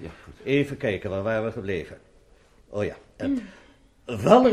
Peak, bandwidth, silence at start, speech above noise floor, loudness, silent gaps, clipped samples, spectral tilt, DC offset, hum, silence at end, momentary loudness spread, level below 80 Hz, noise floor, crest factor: -2 dBFS; 13.5 kHz; 0 s; 33 dB; -26 LUFS; none; under 0.1%; -7 dB/octave; under 0.1%; none; 0 s; 18 LU; -54 dBFS; -56 dBFS; 22 dB